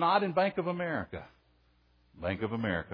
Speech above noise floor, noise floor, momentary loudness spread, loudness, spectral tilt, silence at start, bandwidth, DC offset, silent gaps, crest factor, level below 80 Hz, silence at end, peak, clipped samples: 36 dB; -67 dBFS; 13 LU; -32 LUFS; -9 dB/octave; 0 s; 5.2 kHz; under 0.1%; none; 20 dB; -60 dBFS; 0 s; -12 dBFS; under 0.1%